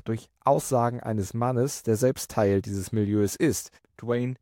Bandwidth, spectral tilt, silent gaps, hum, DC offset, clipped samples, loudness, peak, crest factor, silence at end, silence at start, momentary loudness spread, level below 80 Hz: 17 kHz; -6 dB/octave; none; none; under 0.1%; under 0.1%; -26 LUFS; -10 dBFS; 16 dB; 0.05 s; 0.05 s; 6 LU; -58 dBFS